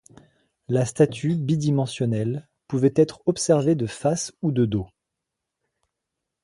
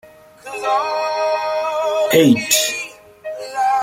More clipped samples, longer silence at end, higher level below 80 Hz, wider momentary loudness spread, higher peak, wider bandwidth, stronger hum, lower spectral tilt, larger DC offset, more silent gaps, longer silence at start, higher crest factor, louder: neither; first, 1.55 s vs 0 s; about the same, -56 dBFS vs -60 dBFS; second, 8 LU vs 18 LU; second, -4 dBFS vs 0 dBFS; second, 11.5 kHz vs 16.5 kHz; neither; first, -6.5 dB/octave vs -3 dB/octave; neither; neither; first, 0.7 s vs 0.05 s; about the same, 20 dB vs 18 dB; second, -23 LUFS vs -17 LUFS